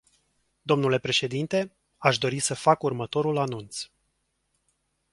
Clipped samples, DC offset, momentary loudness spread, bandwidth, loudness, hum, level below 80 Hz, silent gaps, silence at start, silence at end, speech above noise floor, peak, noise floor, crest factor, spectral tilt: under 0.1%; under 0.1%; 14 LU; 11.5 kHz; -25 LUFS; none; -64 dBFS; none; 0.65 s; 1.3 s; 49 dB; -4 dBFS; -75 dBFS; 24 dB; -4 dB/octave